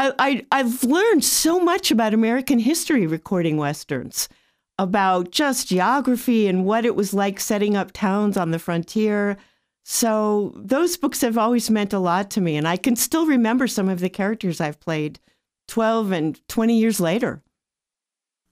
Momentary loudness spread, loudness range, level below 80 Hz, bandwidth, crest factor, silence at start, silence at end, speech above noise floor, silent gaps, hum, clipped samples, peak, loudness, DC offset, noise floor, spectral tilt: 7 LU; 4 LU; -58 dBFS; 16 kHz; 16 dB; 0 s; 1.15 s; 68 dB; none; none; under 0.1%; -4 dBFS; -21 LUFS; under 0.1%; -88 dBFS; -4.5 dB/octave